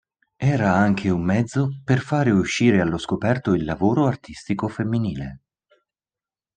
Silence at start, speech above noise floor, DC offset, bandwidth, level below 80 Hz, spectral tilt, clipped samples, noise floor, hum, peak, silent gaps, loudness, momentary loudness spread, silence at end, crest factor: 0.4 s; over 69 dB; under 0.1%; 9.6 kHz; -50 dBFS; -7 dB/octave; under 0.1%; under -90 dBFS; none; -4 dBFS; none; -21 LUFS; 8 LU; 1.2 s; 18 dB